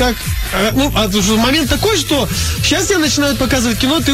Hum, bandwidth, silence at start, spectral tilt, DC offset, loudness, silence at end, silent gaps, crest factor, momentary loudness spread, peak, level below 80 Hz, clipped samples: none; 16.5 kHz; 0 s; -3.5 dB/octave; under 0.1%; -14 LUFS; 0 s; none; 12 dB; 4 LU; -2 dBFS; -26 dBFS; under 0.1%